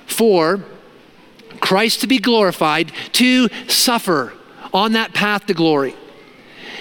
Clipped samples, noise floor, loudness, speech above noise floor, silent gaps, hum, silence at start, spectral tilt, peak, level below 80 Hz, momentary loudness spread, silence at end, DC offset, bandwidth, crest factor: under 0.1%; -45 dBFS; -16 LUFS; 30 dB; none; none; 0.1 s; -3.5 dB/octave; 0 dBFS; -62 dBFS; 8 LU; 0 s; under 0.1%; 17.5 kHz; 16 dB